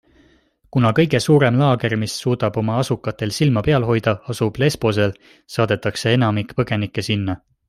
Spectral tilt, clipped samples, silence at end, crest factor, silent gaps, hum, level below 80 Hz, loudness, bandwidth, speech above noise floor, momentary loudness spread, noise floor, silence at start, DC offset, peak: -6 dB/octave; under 0.1%; 0.35 s; 16 dB; none; none; -48 dBFS; -19 LUFS; 14 kHz; 38 dB; 8 LU; -56 dBFS; 0.75 s; under 0.1%; -2 dBFS